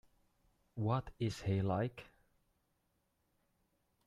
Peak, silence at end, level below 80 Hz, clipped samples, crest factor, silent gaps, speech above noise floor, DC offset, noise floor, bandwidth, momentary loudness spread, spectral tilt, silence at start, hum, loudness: -22 dBFS; 2 s; -66 dBFS; under 0.1%; 20 dB; none; 44 dB; under 0.1%; -81 dBFS; 12 kHz; 12 LU; -7.5 dB/octave; 0.75 s; none; -38 LUFS